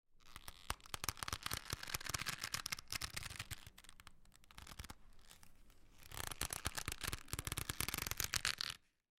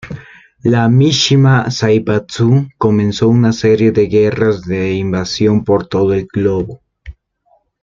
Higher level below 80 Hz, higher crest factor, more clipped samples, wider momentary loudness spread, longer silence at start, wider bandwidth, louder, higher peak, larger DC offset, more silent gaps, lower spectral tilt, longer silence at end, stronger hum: second, -58 dBFS vs -44 dBFS; first, 34 dB vs 12 dB; neither; first, 20 LU vs 7 LU; about the same, 0.1 s vs 0.05 s; first, 16.5 kHz vs 7.6 kHz; second, -43 LUFS vs -13 LUFS; second, -14 dBFS vs 0 dBFS; neither; neither; second, -1.5 dB/octave vs -6.5 dB/octave; second, 0.45 s vs 0.7 s; neither